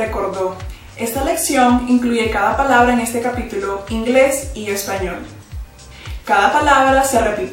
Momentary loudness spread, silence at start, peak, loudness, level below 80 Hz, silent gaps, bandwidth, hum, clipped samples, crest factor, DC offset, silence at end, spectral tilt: 19 LU; 0 s; 0 dBFS; -16 LUFS; -34 dBFS; none; 17 kHz; none; under 0.1%; 16 dB; under 0.1%; 0 s; -4 dB/octave